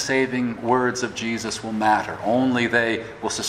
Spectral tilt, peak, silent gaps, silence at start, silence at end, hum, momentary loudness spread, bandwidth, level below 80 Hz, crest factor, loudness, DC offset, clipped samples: -4 dB/octave; -4 dBFS; none; 0 s; 0 s; none; 7 LU; 14.5 kHz; -56 dBFS; 18 dB; -22 LUFS; under 0.1%; under 0.1%